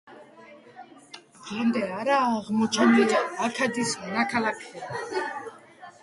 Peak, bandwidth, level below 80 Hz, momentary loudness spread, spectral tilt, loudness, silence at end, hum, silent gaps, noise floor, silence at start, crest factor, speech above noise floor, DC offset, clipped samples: -8 dBFS; 11.5 kHz; -68 dBFS; 20 LU; -4 dB/octave; -25 LUFS; 0.1 s; none; none; -50 dBFS; 0.05 s; 20 dB; 25 dB; under 0.1%; under 0.1%